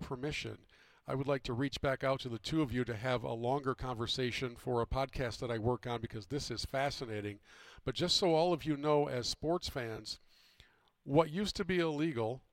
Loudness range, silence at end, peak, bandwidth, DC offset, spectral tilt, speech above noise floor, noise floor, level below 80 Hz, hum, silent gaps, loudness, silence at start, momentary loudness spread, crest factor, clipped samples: 3 LU; 0.15 s; -14 dBFS; 16.5 kHz; under 0.1%; -5 dB/octave; 31 dB; -66 dBFS; -54 dBFS; none; none; -36 LUFS; 0 s; 10 LU; 22 dB; under 0.1%